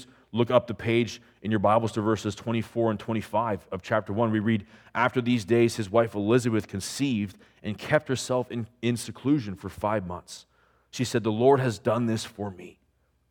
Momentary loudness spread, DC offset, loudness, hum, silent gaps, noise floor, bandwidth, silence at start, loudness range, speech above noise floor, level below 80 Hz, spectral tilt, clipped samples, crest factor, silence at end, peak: 13 LU; under 0.1%; -27 LUFS; none; none; -69 dBFS; 17.5 kHz; 0 s; 4 LU; 43 dB; -62 dBFS; -6 dB/octave; under 0.1%; 20 dB; 0.6 s; -6 dBFS